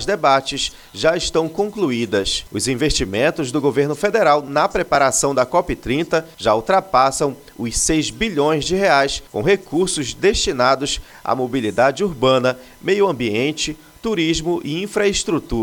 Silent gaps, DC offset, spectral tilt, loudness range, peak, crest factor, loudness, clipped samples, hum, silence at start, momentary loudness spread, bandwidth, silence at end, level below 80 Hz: none; under 0.1%; -3.5 dB/octave; 2 LU; 0 dBFS; 18 dB; -18 LUFS; under 0.1%; none; 0 s; 7 LU; 19 kHz; 0 s; -38 dBFS